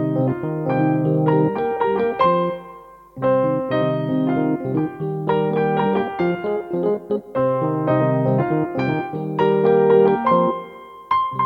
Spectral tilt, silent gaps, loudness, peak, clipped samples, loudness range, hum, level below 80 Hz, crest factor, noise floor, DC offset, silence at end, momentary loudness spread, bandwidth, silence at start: -10 dB/octave; none; -20 LUFS; -4 dBFS; under 0.1%; 3 LU; none; -56 dBFS; 16 dB; -41 dBFS; under 0.1%; 0 s; 8 LU; 5.2 kHz; 0 s